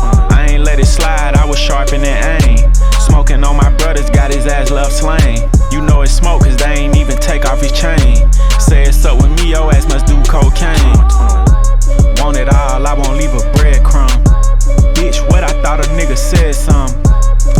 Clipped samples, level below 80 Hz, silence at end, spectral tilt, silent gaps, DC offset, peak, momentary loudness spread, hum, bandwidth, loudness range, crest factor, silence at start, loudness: under 0.1%; -8 dBFS; 0 s; -5 dB/octave; none; under 0.1%; 0 dBFS; 4 LU; none; 13.5 kHz; 1 LU; 8 dB; 0 s; -11 LUFS